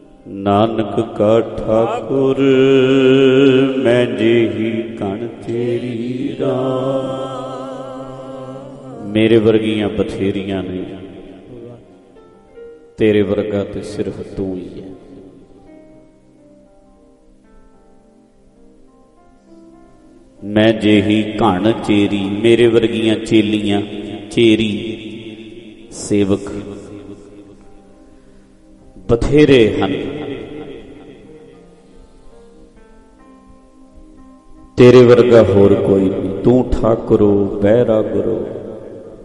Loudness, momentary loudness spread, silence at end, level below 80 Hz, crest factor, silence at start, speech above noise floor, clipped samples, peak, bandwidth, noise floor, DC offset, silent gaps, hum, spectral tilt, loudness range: -14 LUFS; 21 LU; 0 s; -38 dBFS; 16 dB; 0.25 s; 35 dB; under 0.1%; 0 dBFS; 11.5 kHz; -48 dBFS; under 0.1%; none; none; -7 dB/octave; 12 LU